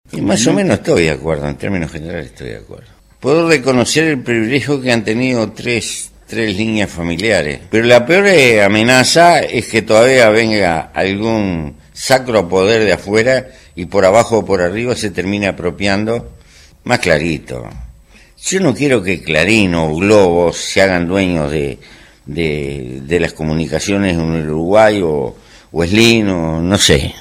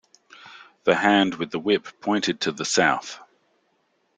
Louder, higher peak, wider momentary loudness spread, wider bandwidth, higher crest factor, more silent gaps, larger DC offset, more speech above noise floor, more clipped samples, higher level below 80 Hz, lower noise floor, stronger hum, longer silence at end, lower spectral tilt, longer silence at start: first, -13 LUFS vs -22 LUFS; first, 0 dBFS vs -4 dBFS; about the same, 14 LU vs 13 LU; first, 16 kHz vs 9.6 kHz; second, 14 dB vs 22 dB; neither; neither; second, 30 dB vs 46 dB; neither; first, -36 dBFS vs -66 dBFS; second, -43 dBFS vs -69 dBFS; neither; second, 0 s vs 1 s; about the same, -4.5 dB/octave vs -3.5 dB/octave; second, 0.15 s vs 0.45 s